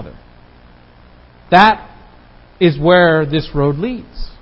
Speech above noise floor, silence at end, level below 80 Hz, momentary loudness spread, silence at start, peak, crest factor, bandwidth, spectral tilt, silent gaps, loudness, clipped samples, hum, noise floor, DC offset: 31 dB; 0.1 s; -36 dBFS; 14 LU; 0 s; 0 dBFS; 16 dB; 8 kHz; -8 dB/octave; none; -13 LUFS; under 0.1%; 60 Hz at -40 dBFS; -43 dBFS; under 0.1%